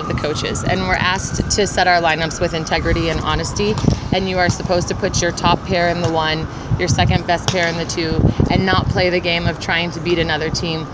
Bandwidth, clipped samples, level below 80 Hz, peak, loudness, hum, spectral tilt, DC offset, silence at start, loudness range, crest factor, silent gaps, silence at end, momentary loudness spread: 8 kHz; under 0.1%; -30 dBFS; 0 dBFS; -17 LUFS; none; -4.5 dB/octave; under 0.1%; 0 s; 1 LU; 18 dB; none; 0 s; 5 LU